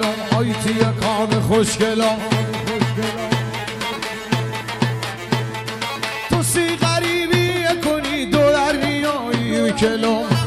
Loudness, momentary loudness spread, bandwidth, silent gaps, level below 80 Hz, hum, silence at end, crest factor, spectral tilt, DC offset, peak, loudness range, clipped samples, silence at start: -19 LUFS; 7 LU; 16 kHz; none; -44 dBFS; none; 0 s; 16 dB; -5 dB/octave; under 0.1%; -4 dBFS; 5 LU; under 0.1%; 0 s